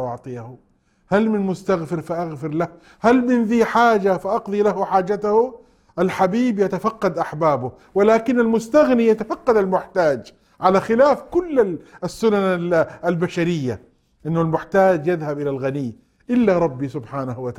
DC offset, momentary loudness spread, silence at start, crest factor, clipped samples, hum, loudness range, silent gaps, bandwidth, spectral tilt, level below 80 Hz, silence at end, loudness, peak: under 0.1%; 12 LU; 0 s; 18 dB; under 0.1%; none; 3 LU; none; 13.5 kHz; -7 dB/octave; -54 dBFS; 0.05 s; -19 LUFS; -2 dBFS